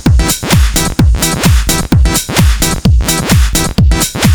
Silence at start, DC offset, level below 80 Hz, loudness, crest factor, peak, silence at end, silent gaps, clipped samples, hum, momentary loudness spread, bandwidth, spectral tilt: 0 s; under 0.1%; -12 dBFS; -10 LUFS; 8 dB; 0 dBFS; 0 s; none; under 0.1%; none; 2 LU; over 20 kHz; -4 dB/octave